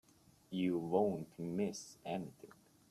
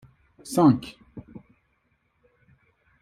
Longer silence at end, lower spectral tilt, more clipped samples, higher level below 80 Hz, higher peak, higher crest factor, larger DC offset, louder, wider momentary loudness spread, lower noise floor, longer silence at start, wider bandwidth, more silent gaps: second, 0.45 s vs 1.65 s; about the same, -6.5 dB/octave vs -7 dB/octave; neither; second, -76 dBFS vs -62 dBFS; second, -20 dBFS vs -6 dBFS; about the same, 22 dB vs 22 dB; neither; second, -39 LUFS vs -22 LUFS; second, 16 LU vs 26 LU; second, -64 dBFS vs -70 dBFS; about the same, 0.5 s vs 0.45 s; about the same, 14 kHz vs 14 kHz; neither